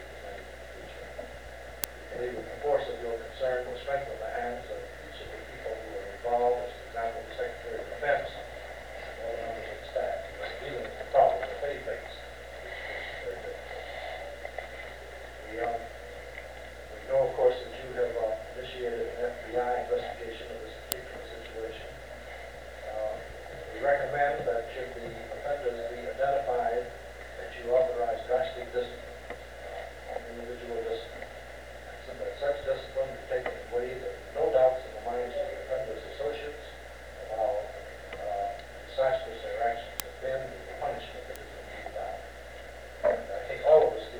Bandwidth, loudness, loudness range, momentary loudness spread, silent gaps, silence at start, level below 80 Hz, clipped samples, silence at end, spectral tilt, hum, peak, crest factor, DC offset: over 20 kHz; -33 LUFS; 7 LU; 15 LU; none; 0 s; -52 dBFS; under 0.1%; 0 s; -4 dB/octave; 60 Hz at -50 dBFS; -2 dBFS; 30 dB; 0.2%